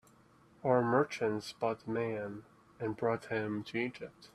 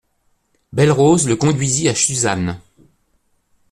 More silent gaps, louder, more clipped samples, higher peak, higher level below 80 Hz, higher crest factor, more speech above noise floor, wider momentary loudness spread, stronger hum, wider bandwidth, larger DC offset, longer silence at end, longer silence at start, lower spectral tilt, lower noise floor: neither; second, -35 LUFS vs -16 LUFS; neither; second, -14 dBFS vs -2 dBFS; second, -72 dBFS vs -50 dBFS; about the same, 20 dB vs 16 dB; second, 29 dB vs 48 dB; about the same, 11 LU vs 12 LU; neither; about the same, 13 kHz vs 13 kHz; neither; second, 0.05 s vs 1.15 s; about the same, 0.65 s vs 0.75 s; first, -6.5 dB/octave vs -4.5 dB/octave; about the same, -64 dBFS vs -63 dBFS